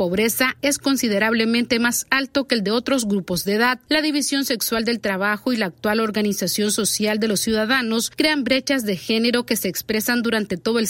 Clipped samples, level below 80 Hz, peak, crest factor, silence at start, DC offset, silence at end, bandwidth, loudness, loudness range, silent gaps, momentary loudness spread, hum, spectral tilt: under 0.1%; -54 dBFS; -2 dBFS; 18 dB; 0 s; under 0.1%; 0 s; 16.5 kHz; -20 LUFS; 1 LU; none; 4 LU; none; -3 dB/octave